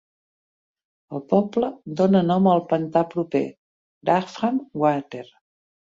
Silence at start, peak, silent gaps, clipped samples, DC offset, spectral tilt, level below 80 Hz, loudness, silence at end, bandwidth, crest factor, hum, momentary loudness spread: 1.1 s; -4 dBFS; 3.58-4.01 s; under 0.1%; under 0.1%; -8 dB/octave; -66 dBFS; -22 LUFS; 0.7 s; 7.6 kHz; 18 dB; none; 14 LU